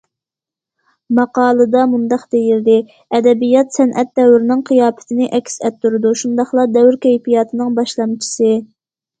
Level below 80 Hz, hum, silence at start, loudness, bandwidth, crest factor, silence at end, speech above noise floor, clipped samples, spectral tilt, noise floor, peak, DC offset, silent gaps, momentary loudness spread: -62 dBFS; none; 1.1 s; -14 LUFS; 9.2 kHz; 14 dB; 0.55 s; 74 dB; under 0.1%; -5 dB/octave; -87 dBFS; 0 dBFS; under 0.1%; none; 7 LU